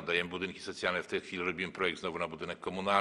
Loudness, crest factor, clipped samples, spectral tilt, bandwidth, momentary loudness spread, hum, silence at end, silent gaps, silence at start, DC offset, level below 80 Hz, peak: -35 LUFS; 24 dB; under 0.1%; -4 dB/octave; 12 kHz; 6 LU; none; 0 s; none; 0 s; under 0.1%; -68 dBFS; -12 dBFS